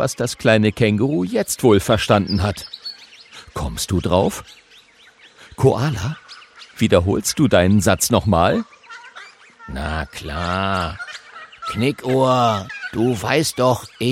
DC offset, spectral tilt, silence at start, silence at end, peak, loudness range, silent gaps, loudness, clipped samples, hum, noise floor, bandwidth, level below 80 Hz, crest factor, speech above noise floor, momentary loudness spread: under 0.1%; -5 dB/octave; 0 s; 0 s; 0 dBFS; 6 LU; none; -18 LUFS; under 0.1%; none; -49 dBFS; 16.5 kHz; -40 dBFS; 20 dB; 31 dB; 19 LU